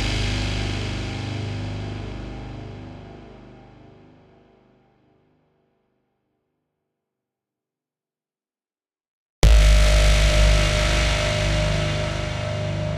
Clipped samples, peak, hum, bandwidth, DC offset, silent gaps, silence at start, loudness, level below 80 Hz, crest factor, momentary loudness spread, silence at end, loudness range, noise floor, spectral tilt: under 0.1%; 0 dBFS; none; 12.5 kHz; under 0.1%; 9.08-9.42 s; 0 s; -21 LUFS; -24 dBFS; 22 dB; 19 LU; 0 s; 20 LU; under -90 dBFS; -4.5 dB/octave